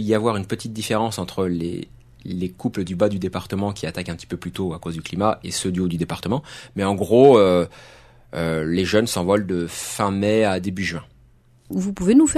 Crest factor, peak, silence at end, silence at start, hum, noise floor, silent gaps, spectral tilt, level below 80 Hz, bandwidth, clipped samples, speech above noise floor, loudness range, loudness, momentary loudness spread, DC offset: 20 dB; -2 dBFS; 0 s; 0 s; none; -53 dBFS; none; -5.5 dB/octave; -48 dBFS; 13.5 kHz; under 0.1%; 33 dB; 7 LU; -21 LUFS; 14 LU; under 0.1%